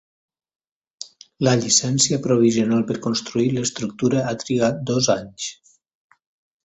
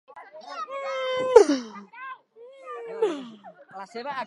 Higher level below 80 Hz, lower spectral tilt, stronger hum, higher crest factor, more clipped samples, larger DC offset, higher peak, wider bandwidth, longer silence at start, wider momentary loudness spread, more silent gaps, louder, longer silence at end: first, -56 dBFS vs -66 dBFS; about the same, -4 dB/octave vs -3.5 dB/octave; neither; second, 20 dB vs 26 dB; neither; neither; about the same, -2 dBFS vs 0 dBFS; second, 8.4 kHz vs 11.5 kHz; first, 1 s vs 0.1 s; second, 14 LU vs 27 LU; neither; first, -20 LUFS vs -23 LUFS; first, 1.1 s vs 0 s